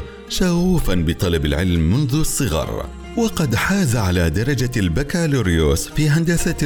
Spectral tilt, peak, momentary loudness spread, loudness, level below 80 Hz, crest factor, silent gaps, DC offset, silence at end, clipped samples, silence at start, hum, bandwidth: -5.5 dB/octave; -6 dBFS; 4 LU; -19 LUFS; -28 dBFS; 12 dB; none; under 0.1%; 0 s; under 0.1%; 0 s; none; over 20 kHz